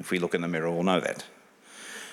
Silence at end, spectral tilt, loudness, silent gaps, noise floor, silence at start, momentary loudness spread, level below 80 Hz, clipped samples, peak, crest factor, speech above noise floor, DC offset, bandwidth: 0 s; -5 dB/octave; -28 LUFS; none; -49 dBFS; 0 s; 17 LU; -74 dBFS; under 0.1%; -8 dBFS; 22 dB; 21 dB; under 0.1%; 15.5 kHz